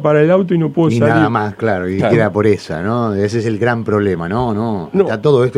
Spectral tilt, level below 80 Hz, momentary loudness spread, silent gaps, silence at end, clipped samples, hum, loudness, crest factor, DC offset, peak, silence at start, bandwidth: -8 dB/octave; -46 dBFS; 6 LU; none; 0 s; under 0.1%; none; -15 LUFS; 14 dB; under 0.1%; 0 dBFS; 0 s; 11 kHz